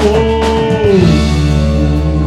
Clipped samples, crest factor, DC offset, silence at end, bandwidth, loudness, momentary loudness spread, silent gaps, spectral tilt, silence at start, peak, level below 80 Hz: under 0.1%; 10 dB; under 0.1%; 0 s; 11.5 kHz; -11 LUFS; 3 LU; none; -7 dB/octave; 0 s; 0 dBFS; -16 dBFS